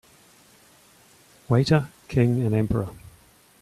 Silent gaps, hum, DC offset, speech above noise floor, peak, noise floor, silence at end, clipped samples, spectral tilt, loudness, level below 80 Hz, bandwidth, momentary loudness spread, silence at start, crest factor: none; none; under 0.1%; 34 dB; -6 dBFS; -55 dBFS; 0.7 s; under 0.1%; -7.5 dB/octave; -23 LUFS; -48 dBFS; 13.5 kHz; 8 LU; 1.5 s; 20 dB